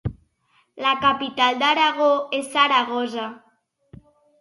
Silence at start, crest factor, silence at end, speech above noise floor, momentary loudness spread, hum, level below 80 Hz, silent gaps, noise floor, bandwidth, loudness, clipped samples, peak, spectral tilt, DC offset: 0.05 s; 18 dB; 1.05 s; 44 dB; 11 LU; none; -50 dBFS; none; -64 dBFS; 11.5 kHz; -20 LUFS; under 0.1%; -4 dBFS; -4 dB/octave; under 0.1%